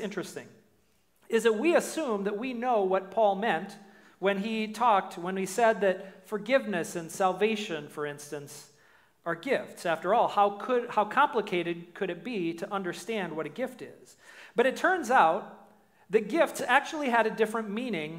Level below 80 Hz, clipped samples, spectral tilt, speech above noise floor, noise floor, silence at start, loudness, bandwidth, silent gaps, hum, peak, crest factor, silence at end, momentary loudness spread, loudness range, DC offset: -78 dBFS; under 0.1%; -4.5 dB/octave; 41 dB; -69 dBFS; 0 s; -28 LUFS; 16 kHz; none; none; -8 dBFS; 22 dB; 0 s; 12 LU; 5 LU; under 0.1%